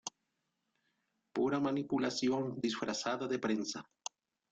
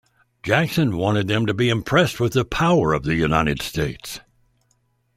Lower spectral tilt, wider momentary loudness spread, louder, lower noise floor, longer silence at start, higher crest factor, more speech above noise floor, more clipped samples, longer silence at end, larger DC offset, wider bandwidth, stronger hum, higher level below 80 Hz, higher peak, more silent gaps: second, -4.5 dB/octave vs -6 dB/octave; first, 14 LU vs 9 LU; second, -36 LUFS vs -20 LUFS; first, -84 dBFS vs -66 dBFS; second, 0.05 s vs 0.45 s; about the same, 14 dB vs 18 dB; about the same, 49 dB vs 46 dB; neither; second, 0.7 s vs 1 s; neither; second, 9.2 kHz vs 15.5 kHz; neither; second, -76 dBFS vs -42 dBFS; second, -22 dBFS vs -2 dBFS; neither